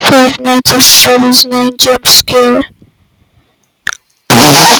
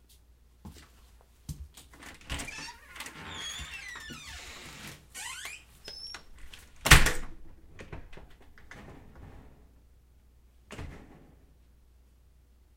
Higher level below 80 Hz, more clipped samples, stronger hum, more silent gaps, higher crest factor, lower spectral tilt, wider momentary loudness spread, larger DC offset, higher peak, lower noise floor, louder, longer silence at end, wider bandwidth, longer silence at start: about the same, -42 dBFS vs -40 dBFS; first, 2% vs under 0.1%; neither; neither; second, 8 dB vs 30 dB; about the same, -2.5 dB/octave vs -2.5 dB/octave; about the same, 17 LU vs 19 LU; neither; first, 0 dBFS vs -4 dBFS; second, -52 dBFS vs -60 dBFS; first, -5 LUFS vs -30 LUFS; second, 0 s vs 1.6 s; first, over 20 kHz vs 16.5 kHz; second, 0 s vs 0.65 s